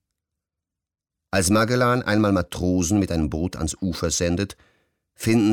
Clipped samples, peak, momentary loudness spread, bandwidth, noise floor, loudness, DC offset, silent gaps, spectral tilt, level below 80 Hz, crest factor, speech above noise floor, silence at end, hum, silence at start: under 0.1%; -8 dBFS; 8 LU; 18 kHz; -88 dBFS; -22 LUFS; under 0.1%; none; -5 dB/octave; -44 dBFS; 14 dB; 66 dB; 0 s; none; 1.35 s